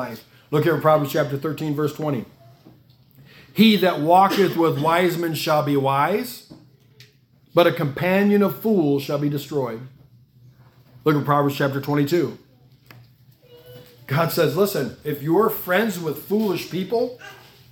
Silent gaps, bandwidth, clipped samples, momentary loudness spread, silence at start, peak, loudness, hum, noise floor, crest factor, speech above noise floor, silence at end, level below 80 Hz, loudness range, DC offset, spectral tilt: none; 18 kHz; under 0.1%; 11 LU; 0 s; -2 dBFS; -21 LUFS; none; -56 dBFS; 20 dB; 36 dB; 0.35 s; -64 dBFS; 5 LU; under 0.1%; -6 dB/octave